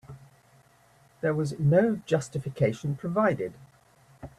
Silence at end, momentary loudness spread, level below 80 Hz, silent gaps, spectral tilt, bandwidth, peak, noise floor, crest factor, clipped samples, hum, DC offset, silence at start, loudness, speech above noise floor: 0.1 s; 11 LU; -62 dBFS; none; -7.5 dB/octave; 12 kHz; -10 dBFS; -60 dBFS; 18 dB; under 0.1%; none; under 0.1%; 0.1 s; -27 LUFS; 34 dB